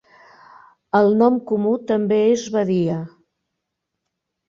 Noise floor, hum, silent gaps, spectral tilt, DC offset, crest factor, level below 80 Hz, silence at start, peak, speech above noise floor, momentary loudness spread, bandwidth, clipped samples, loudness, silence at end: -79 dBFS; none; none; -7 dB/octave; under 0.1%; 16 dB; -64 dBFS; 0.95 s; -4 dBFS; 62 dB; 8 LU; 7.4 kHz; under 0.1%; -19 LUFS; 1.4 s